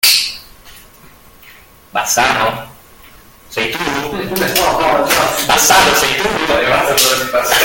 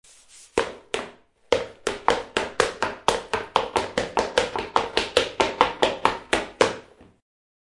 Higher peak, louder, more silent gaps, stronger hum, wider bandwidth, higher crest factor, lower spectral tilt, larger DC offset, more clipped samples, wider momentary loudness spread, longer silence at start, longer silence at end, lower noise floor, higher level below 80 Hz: about the same, 0 dBFS vs 0 dBFS; first, -12 LUFS vs -25 LUFS; neither; neither; first, over 20 kHz vs 11.5 kHz; second, 14 dB vs 26 dB; about the same, -1.5 dB/octave vs -2.5 dB/octave; neither; neither; first, 11 LU vs 8 LU; second, 0.05 s vs 0.35 s; second, 0 s vs 0.8 s; second, -41 dBFS vs -51 dBFS; first, -40 dBFS vs -50 dBFS